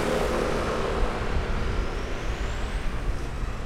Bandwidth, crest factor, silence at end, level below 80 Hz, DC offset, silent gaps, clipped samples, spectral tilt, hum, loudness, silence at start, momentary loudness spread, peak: 14 kHz; 14 dB; 0 s; -30 dBFS; under 0.1%; none; under 0.1%; -5.5 dB/octave; none; -29 LUFS; 0 s; 7 LU; -12 dBFS